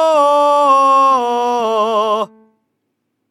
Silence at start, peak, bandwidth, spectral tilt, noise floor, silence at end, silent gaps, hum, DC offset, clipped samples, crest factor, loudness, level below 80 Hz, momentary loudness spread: 0 s; -2 dBFS; 13 kHz; -3 dB/octave; -70 dBFS; 1.05 s; none; none; under 0.1%; under 0.1%; 12 dB; -13 LUFS; -70 dBFS; 7 LU